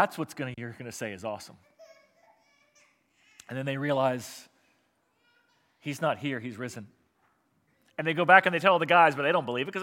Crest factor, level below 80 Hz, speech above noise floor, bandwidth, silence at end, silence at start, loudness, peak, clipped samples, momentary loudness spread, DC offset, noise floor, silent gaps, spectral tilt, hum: 26 dB; -80 dBFS; 45 dB; 16.5 kHz; 0 s; 0 s; -26 LUFS; -4 dBFS; under 0.1%; 21 LU; under 0.1%; -72 dBFS; none; -5 dB/octave; none